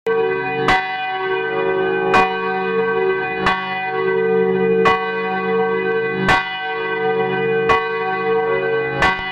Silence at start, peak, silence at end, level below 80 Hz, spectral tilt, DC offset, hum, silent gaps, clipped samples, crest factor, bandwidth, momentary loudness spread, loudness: 0.05 s; -2 dBFS; 0 s; -44 dBFS; -5.5 dB/octave; under 0.1%; none; none; under 0.1%; 16 dB; 10 kHz; 5 LU; -18 LUFS